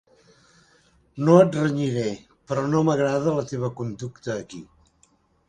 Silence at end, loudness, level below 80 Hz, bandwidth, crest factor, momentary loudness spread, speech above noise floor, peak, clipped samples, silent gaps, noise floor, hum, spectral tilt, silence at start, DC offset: 0.85 s; -23 LUFS; -60 dBFS; 9.8 kHz; 22 dB; 19 LU; 41 dB; -2 dBFS; under 0.1%; none; -63 dBFS; none; -7 dB/octave; 1.15 s; under 0.1%